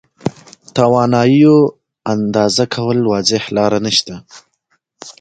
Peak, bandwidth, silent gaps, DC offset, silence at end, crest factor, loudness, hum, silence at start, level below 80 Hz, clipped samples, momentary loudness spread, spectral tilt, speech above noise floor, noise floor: 0 dBFS; 9.2 kHz; none; under 0.1%; 0.1 s; 14 dB; -14 LUFS; none; 0.25 s; -52 dBFS; under 0.1%; 15 LU; -5 dB/octave; 51 dB; -64 dBFS